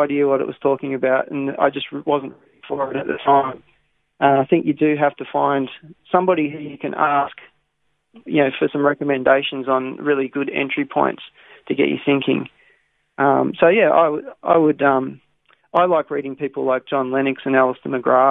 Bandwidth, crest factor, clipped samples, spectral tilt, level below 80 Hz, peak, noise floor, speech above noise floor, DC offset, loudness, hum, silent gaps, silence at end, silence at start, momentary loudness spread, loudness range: 4 kHz; 18 dB; under 0.1%; -9 dB/octave; -64 dBFS; -2 dBFS; -71 dBFS; 52 dB; under 0.1%; -19 LUFS; none; none; 0 s; 0 s; 10 LU; 4 LU